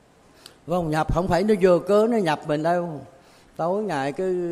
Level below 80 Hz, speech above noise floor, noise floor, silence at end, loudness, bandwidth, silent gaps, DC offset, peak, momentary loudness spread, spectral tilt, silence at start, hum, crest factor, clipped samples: -42 dBFS; 29 dB; -50 dBFS; 0 s; -22 LUFS; 14.5 kHz; none; under 0.1%; -6 dBFS; 12 LU; -7 dB/octave; 0.65 s; none; 16 dB; under 0.1%